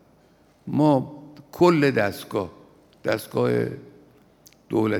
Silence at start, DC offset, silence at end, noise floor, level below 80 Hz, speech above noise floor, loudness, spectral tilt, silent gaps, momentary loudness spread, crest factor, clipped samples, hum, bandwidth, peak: 0.65 s; under 0.1%; 0 s; -57 dBFS; -64 dBFS; 36 dB; -23 LUFS; -7 dB/octave; none; 21 LU; 20 dB; under 0.1%; none; 19.5 kHz; -4 dBFS